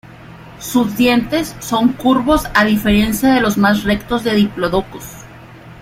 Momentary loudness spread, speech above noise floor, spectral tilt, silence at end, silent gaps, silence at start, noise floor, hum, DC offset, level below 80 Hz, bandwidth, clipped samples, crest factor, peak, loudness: 9 LU; 23 dB; -5 dB/octave; 0 s; none; 0.05 s; -37 dBFS; none; under 0.1%; -36 dBFS; 16.5 kHz; under 0.1%; 14 dB; 0 dBFS; -15 LUFS